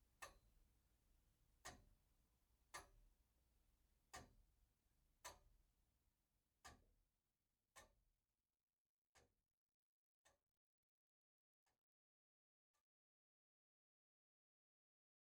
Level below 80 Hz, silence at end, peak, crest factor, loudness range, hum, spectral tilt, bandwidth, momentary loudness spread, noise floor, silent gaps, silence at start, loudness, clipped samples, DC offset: -82 dBFS; 2.45 s; -40 dBFS; 32 dB; 3 LU; none; -2 dB/octave; 11.5 kHz; 6 LU; under -90 dBFS; 8.63-8.67 s, 8.78-9.13 s, 9.53-9.67 s, 9.74-10.25 s, 10.57-11.66 s, 11.78-12.74 s; 0 s; -64 LUFS; under 0.1%; under 0.1%